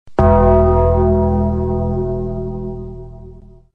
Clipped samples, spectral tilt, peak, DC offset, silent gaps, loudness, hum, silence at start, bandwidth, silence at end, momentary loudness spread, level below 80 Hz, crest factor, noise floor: under 0.1%; -11.5 dB/octave; -2 dBFS; 1%; none; -15 LUFS; none; 0.05 s; 3.3 kHz; 0 s; 18 LU; -24 dBFS; 14 dB; -39 dBFS